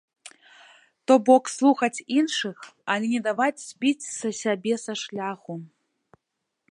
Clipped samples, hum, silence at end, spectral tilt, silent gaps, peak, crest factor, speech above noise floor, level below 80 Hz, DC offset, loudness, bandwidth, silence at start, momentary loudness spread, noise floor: under 0.1%; none; 1.05 s; -3.5 dB/octave; none; -4 dBFS; 20 dB; 58 dB; -80 dBFS; under 0.1%; -24 LUFS; 11 kHz; 0.25 s; 15 LU; -81 dBFS